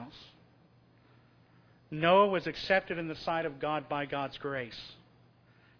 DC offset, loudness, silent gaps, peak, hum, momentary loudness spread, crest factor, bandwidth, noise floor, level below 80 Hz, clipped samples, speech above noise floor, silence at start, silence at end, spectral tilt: under 0.1%; -31 LUFS; none; -12 dBFS; none; 20 LU; 22 dB; 5.4 kHz; -63 dBFS; -66 dBFS; under 0.1%; 32 dB; 0 s; 0.85 s; -6.5 dB/octave